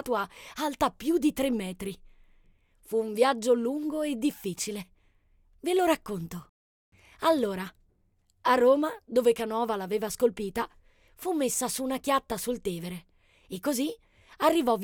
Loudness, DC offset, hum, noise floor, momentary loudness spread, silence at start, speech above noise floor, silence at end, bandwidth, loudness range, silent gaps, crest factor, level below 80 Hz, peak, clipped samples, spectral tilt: -28 LUFS; under 0.1%; none; -69 dBFS; 13 LU; 0 s; 41 dB; 0 s; 19 kHz; 4 LU; 6.49-6.92 s; 20 dB; -58 dBFS; -10 dBFS; under 0.1%; -4 dB/octave